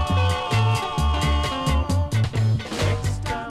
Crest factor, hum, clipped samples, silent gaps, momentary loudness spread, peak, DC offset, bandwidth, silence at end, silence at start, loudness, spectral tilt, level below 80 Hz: 12 dB; none; under 0.1%; none; 3 LU; -10 dBFS; under 0.1%; 13.5 kHz; 0 s; 0 s; -23 LUFS; -5.5 dB/octave; -28 dBFS